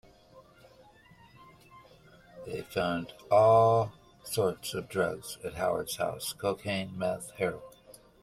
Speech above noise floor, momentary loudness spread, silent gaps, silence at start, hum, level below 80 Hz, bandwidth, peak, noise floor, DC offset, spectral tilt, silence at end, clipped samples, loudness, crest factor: 29 dB; 17 LU; none; 0.35 s; none; -62 dBFS; 16 kHz; -12 dBFS; -58 dBFS; under 0.1%; -5 dB/octave; 0.3 s; under 0.1%; -30 LUFS; 18 dB